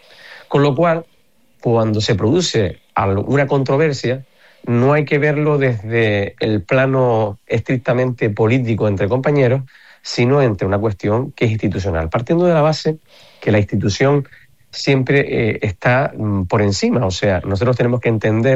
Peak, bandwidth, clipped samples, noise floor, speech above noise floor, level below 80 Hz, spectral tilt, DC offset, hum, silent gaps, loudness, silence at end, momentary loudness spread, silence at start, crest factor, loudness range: -4 dBFS; 8.2 kHz; under 0.1%; -59 dBFS; 43 dB; -46 dBFS; -6.5 dB/octave; 0.5%; none; none; -17 LUFS; 0 s; 6 LU; 0.25 s; 12 dB; 1 LU